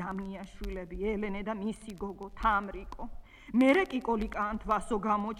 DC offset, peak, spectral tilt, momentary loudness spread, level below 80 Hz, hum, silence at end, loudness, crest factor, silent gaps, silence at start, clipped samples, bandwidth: under 0.1%; -12 dBFS; -6 dB/octave; 16 LU; -46 dBFS; none; 0 s; -32 LUFS; 20 dB; none; 0 s; under 0.1%; 13.5 kHz